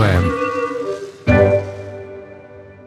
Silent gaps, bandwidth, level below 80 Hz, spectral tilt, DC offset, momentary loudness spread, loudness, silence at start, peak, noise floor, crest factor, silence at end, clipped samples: none; 12 kHz; -36 dBFS; -7.5 dB/octave; under 0.1%; 22 LU; -18 LUFS; 0 s; -2 dBFS; -39 dBFS; 16 dB; 0 s; under 0.1%